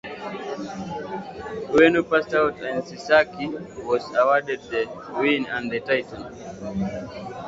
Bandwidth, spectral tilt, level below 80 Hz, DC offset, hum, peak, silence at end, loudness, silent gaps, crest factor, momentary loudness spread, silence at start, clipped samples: 7.8 kHz; -5.5 dB/octave; -54 dBFS; under 0.1%; none; -2 dBFS; 0 s; -23 LUFS; none; 22 dB; 15 LU; 0.05 s; under 0.1%